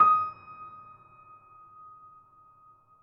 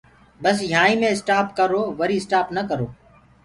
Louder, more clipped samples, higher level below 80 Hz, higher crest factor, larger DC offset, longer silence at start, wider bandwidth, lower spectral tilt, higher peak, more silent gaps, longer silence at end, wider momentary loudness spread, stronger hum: second, -25 LUFS vs -20 LUFS; neither; second, -76 dBFS vs -56 dBFS; about the same, 22 dB vs 18 dB; neither; second, 0 s vs 0.4 s; second, 5.4 kHz vs 11.5 kHz; about the same, -3.5 dB/octave vs -4.5 dB/octave; second, -10 dBFS vs -4 dBFS; neither; first, 2.35 s vs 0.5 s; first, 26 LU vs 8 LU; neither